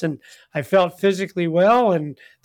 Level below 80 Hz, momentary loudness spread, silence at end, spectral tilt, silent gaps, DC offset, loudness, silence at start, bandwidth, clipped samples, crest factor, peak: -66 dBFS; 15 LU; 0.3 s; -6.5 dB/octave; none; under 0.1%; -19 LUFS; 0 s; 18 kHz; under 0.1%; 12 dB; -8 dBFS